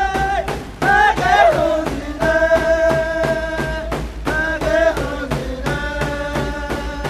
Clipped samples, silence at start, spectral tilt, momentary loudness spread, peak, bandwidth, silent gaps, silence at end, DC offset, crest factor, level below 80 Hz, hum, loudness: under 0.1%; 0 s; -5 dB/octave; 11 LU; 0 dBFS; 14 kHz; none; 0 s; under 0.1%; 18 dB; -30 dBFS; none; -18 LUFS